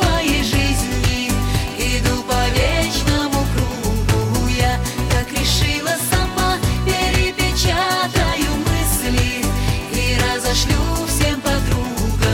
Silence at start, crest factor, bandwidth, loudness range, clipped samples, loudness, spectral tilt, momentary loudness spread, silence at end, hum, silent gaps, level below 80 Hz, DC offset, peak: 0 s; 12 dB; 17 kHz; 1 LU; under 0.1%; -18 LUFS; -4 dB/octave; 3 LU; 0 s; none; none; -24 dBFS; under 0.1%; -6 dBFS